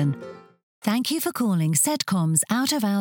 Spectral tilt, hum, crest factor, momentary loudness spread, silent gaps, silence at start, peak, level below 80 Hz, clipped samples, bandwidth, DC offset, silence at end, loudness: -4 dB/octave; none; 18 dB; 8 LU; 0.63-0.82 s; 0 s; -6 dBFS; -72 dBFS; under 0.1%; 17.5 kHz; under 0.1%; 0 s; -23 LUFS